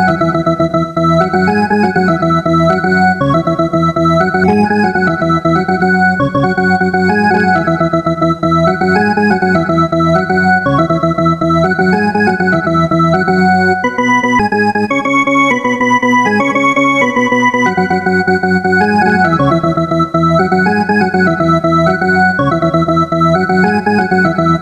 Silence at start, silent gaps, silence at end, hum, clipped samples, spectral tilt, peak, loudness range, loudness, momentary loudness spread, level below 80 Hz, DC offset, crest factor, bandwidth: 0 s; none; 0 s; none; under 0.1%; -7 dB/octave; 0 dBFS; 1 LU; -11 LUFS; 2 LU; -38 dBFS; under 0.1%; 10 dB; 10.5 kHz